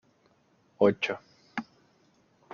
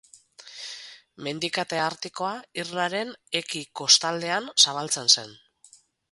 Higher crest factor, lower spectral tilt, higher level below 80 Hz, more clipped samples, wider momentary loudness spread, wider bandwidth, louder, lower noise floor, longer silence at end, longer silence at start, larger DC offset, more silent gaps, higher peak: about the same, 24 dB vs 24 dB; first, -4 dB/octave vs -1 dB/octave; about the same, -72 dBFS vs -74 dBFS; neither; second, 15 LU vs 19 LU; second, 7 kHz vs 12 kHz; second, -30 LUFS vs -23 LUFS; first, -67 dBFS vs -57 dBFS; first, 0.9 s vs 0.75 s; first, 0.8 s vs 0.4 s; neither; neither; second, -10 dBFS vs -2 dBFS